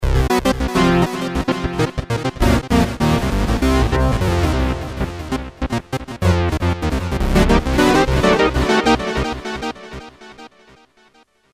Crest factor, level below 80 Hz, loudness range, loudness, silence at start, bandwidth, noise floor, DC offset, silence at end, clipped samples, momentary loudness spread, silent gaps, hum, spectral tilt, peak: 16 dB; -24 dBFS; 4 LU; -18 LUFS; 0 s; 16 kHz; -54 dBFS; under 0.1%; 1.05 s; under 0.1%; 11 LU; none; none; -6 dB/octave; -2 dBFS